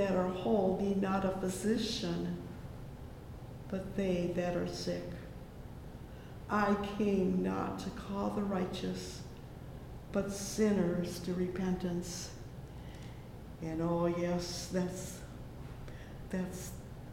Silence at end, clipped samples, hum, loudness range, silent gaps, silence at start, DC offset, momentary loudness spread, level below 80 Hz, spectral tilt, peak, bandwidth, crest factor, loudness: 0 s; under 0.1%; none; 4 LU; none; 0 s; under 0.1%; 17 LU; -52 dBFS; -6 dB/octave; -18 dBFS; 16.5 kHz; 18 dB; -35 LUFS